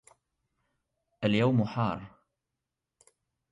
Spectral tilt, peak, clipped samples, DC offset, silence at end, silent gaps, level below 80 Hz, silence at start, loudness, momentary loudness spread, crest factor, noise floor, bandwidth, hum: -8 dB/octave; -16 dBFS; under 0.1%; under 0.1%; 1.45 s; none; -64 dBFS; 1.2 s; -29 LUFS; 8 LU; 18 dB; -87 dBFS; 11 kHz; none